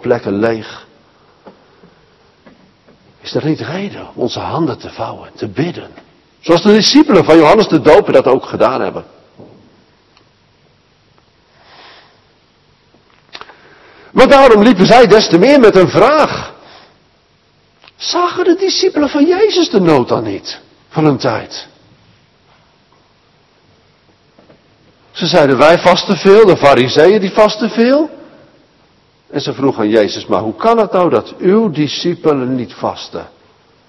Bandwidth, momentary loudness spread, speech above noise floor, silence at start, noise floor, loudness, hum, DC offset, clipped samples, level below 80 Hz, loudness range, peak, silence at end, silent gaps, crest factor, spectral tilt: 12 kHz; 18 LU; 42 dB; 0.05 s; -52 dBFS; -10 LUFS; none; under 0.1%; 1%; -46 dBFS; 13 LU; 0 dBFS; 0.6 s; none; 12 dB; -5.5 dB/octave